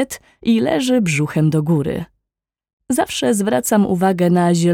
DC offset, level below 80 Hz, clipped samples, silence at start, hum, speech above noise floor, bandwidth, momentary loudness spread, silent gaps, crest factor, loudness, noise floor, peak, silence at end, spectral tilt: under 0.1%; -50 dBFS; under 0.1%; 0 s; none; 68 dB; 16.5 kHz; 9 LU; 2.73-2.78 s; 14 dB; -17 LUFS; -84 dBFS; -4 dBFS; 0 s; -5.5 dB/octave